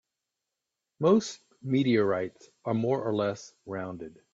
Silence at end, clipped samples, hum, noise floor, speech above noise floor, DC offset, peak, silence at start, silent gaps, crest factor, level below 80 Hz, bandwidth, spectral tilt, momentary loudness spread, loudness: 0.25 s; under 0.1%; none; -87 dBFS; 58 dB; under 0.1%; -10 dBFS; 1 s; none; 20 dB; -72 dBFS; 7.8 kHz; -6.5 dB/octave; 15 LU; -28 LUFS